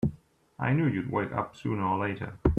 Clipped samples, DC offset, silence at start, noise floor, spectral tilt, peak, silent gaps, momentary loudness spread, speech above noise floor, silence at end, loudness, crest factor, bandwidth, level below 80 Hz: under 0.1%; under 0.1%; 0 s; -51 dBFS; -9 dB/octave; -8 dBFS; none; 6 LU; 23 dB; 0 s; -30 LUFS; 20 dB; 8.2 kHz; -42 dBFS